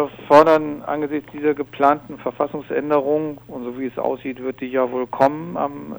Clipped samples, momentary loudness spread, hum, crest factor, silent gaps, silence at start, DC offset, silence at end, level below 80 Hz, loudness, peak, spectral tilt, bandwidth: under 0.1%; 14 LU; none; 20 dB; none; 0 s; under 0.1%; 0 s; -58 dBFS; -20 LUFS; 0 dBFS; -7 dB/octave; over 20 kHz